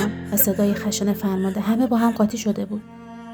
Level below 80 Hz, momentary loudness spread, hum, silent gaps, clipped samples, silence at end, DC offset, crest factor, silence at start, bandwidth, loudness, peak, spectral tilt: -54 dBFS; 12 LU; none; none; under 0.1%; 0 s; under 0.1%; 18 dB; 0 s; over 20 kHz; -21 LUFS; -4 dBFS; -5.5 dB/octave